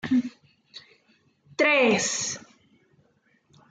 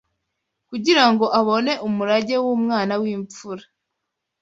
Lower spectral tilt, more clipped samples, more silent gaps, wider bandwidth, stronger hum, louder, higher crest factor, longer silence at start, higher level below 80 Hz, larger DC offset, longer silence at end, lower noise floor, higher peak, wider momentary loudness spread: second, -2.5 dB/octave vs -4.5 dB/octave; neither; neither; first, 9.6 kHz vs 8 kHz; neither; second, -23 LUFS vs -19 LUFS; about the same, 18 dB vs 20 dB; second, 0.05 s vs 0.7 s; second, -72 dBFS vs -66 dBFS; neither; first, 1.35 s vs 0.8 s; second, -66 dBFS vs -80 dBFS; second, -10 dBFS vs -2 dBFS; first, 27 LU vs 18 LU